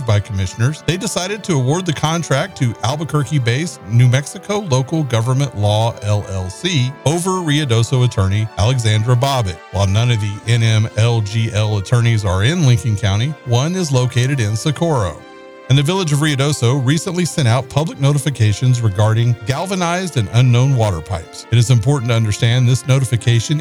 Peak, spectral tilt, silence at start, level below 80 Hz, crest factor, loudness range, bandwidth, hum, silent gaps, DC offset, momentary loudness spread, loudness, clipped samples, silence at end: -2 dBFS; -5.5 dB/octave; 0 s; -44 dBFS; 12 dB; 2 LU; 13.5 kHz; none; none; 0.2%; 5 LU; -16 LUFS; under 0.1%; 0 s